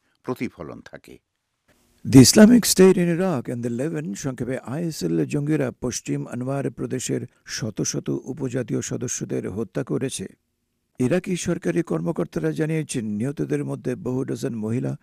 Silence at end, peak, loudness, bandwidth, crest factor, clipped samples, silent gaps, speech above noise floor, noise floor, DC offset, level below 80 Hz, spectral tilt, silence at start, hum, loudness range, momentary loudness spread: 0.05 s; 0 dBFS; -22 LUFS; 15.5 kHz; 22 dB; under 0.1%; none; 52 dB; -74 dBFS; under 0.1%; -52 dBFS; -5 dB/octave; 0.25 s; none; 10 LU; 15 LU